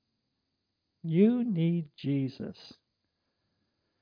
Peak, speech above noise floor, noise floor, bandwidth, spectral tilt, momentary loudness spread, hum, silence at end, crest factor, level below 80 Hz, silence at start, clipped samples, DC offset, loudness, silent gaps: -12 dBFS; 53 dB; -82 dBFS; 5.2 kHz; -10 dB/octave; 17 LU; none; 1.3 s; 20 dB; -78 dBFS; 1.05 s; under 0.1%; under 0.1%; -29 LUFS; none